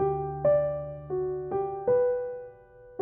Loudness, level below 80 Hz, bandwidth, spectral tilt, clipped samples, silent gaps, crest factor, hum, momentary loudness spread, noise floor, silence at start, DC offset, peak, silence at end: -28 LUFS; -54 dBFS; 3.1 kHz; -9.5 dB/octave; under 0.1%; none; 14 dB; none; 15 LU; -51 dBFS; 0 s; under 0.1%; -14 dBFS; 0 s